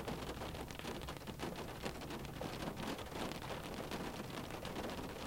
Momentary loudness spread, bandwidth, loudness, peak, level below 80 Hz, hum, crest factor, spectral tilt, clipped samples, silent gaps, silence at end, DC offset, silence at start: 2 LU; 17 kHz; -45 LUFS; -24 dBFS; -56 dBFS; none; 20 dB; -4.5 dB/octave; under 0.1%; none; 0 s; under 0.1%; 0 s